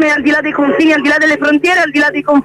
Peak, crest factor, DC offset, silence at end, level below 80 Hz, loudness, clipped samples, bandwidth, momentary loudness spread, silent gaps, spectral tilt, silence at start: -2 dBFS; 10 dB; under 0.1%; 0 s; -50 dBFS; -10 LUFS; under 0.1%; 12 kHz; 3 LU; none; -4 dB/octave; 0 s